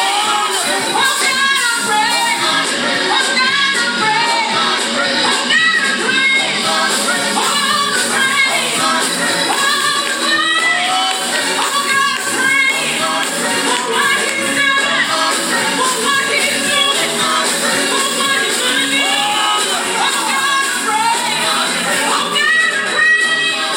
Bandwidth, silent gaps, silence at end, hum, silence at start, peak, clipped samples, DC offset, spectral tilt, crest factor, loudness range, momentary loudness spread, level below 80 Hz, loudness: 19.5 kHz; none; 0 s; none; 0 s; -2 dBFS; under 0.1%; under 0.1%; -0.5 dB/octave; 14 dB; 1 LU; 3 LU; -66 dBFS; -13 LUFS